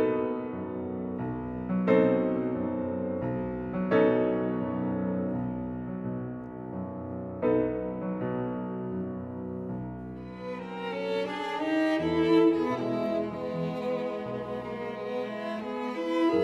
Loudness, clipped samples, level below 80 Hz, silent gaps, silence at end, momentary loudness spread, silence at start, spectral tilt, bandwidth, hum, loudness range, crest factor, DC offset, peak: -30 LUFS; under 0.1%; -56 dBFS; none; 0 s; 13 LU; 0 s; -8 dB/octave; 8 kHz; none; 6 LU; 20 dB; under 0.1%; -10 dBFS